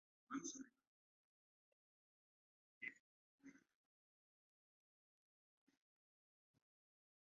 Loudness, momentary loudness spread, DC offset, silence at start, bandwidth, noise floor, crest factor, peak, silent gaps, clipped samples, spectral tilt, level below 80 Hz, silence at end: -54 LUFS; 17 LU; under 0.1%; 0.3 s; 7 kHz; under -90 dBFS; 26 dB; -36 dBFS; 0.87-2.81 s, 3.00-3.38 s; under 0.1%; -2.5 dB/octave; under -90 dBFS; 3.65 s